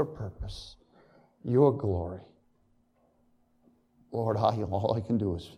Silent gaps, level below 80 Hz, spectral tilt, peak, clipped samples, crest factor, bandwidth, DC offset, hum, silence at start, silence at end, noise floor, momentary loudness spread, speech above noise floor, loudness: none; -52 dBFS; -9 dB/octave; -10 dBFS; under 0.1%; 22 dB; 10.5 kHz; under 0.1%; none; 0 s; 0 s; -68 dBFS; 18 LU; 39 dB; -29 LUFS